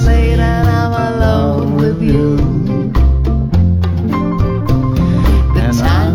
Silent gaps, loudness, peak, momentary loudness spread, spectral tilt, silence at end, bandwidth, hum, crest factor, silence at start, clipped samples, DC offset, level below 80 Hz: none; -13 LUFS; -2 dBFS; 3 LU; -8 dB/octave; 0 s; 14.5 kHz; none; 10 dB; 0 s; under 0.1%; under 0.1%; -16 dBFS